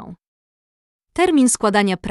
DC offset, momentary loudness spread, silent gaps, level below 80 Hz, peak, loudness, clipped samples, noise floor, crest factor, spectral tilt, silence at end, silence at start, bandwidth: under 0.1%; 6 LU; 0.27-0.99 s; -52 dBFS; -4 dBFS; -16 LUFS; under 0.1%; under -90 dBFS; 16 dB; -4 dB/octave; 0 s; 0 s; 12 kHz